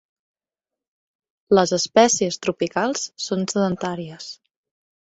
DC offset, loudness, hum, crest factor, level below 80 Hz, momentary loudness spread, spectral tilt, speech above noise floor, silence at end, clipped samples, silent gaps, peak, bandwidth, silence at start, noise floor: under 0.1%; -20 LUFS; none; 20 dB; -62 dBFS; 15 LU; -3.5 dB/octave; 68 dB; 0.8 s; under 0.1%; none; -2 dBFS; 8.2 kHz; 1.5 s; -89 dBFS